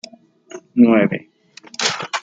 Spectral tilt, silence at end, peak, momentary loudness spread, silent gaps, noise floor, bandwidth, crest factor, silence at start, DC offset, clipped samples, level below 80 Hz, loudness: -4 dB/octave; 0 s; -2 dBFS; 15 LU; none; -44 dBFS; 9 kHz; 18 dB; 0.55 s; under 0.1%; under 0.1%; -64 dBFS; -17 LUFS